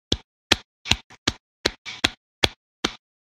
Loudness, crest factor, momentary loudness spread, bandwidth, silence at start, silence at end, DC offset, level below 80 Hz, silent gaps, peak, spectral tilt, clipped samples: -25 LUFS; 28 dB; 6 LU; 16.5 kHz; 0.1 s; 0.35 s; under 0.1%; -42 dBFS; 0.24-0.50 s, 0.65-0.85 s, 1.04-1.10 s, 1.18-1.26 s, 1.40-1.64 s, 1.78-1.85 s, 2.17-2.42 s, 2.56-2.83 s; 0 dBFS; -2.5 dB/octave; under 0.1%